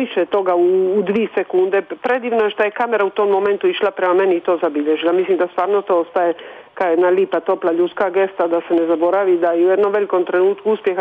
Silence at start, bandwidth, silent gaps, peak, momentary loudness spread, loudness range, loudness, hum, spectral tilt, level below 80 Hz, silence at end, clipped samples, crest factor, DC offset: 0 s; 3.9 kHz; none; -6 dBFS; 4 LU; 1 LU; -17 LUFS; none; -7.5 dB/octave; -68 dBFS; 0 s; under 0.1%; 10 dB; under 0.1%